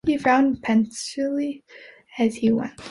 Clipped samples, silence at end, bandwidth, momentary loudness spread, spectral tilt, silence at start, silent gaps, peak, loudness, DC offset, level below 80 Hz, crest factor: under 0.1%; 0 s; 11.5 kHz; 11 LU; -5 dB/octave; 0.05 s; none; -6 dBFS; -22 LUFS; under 0.1%; -56 dBFS; 16 dB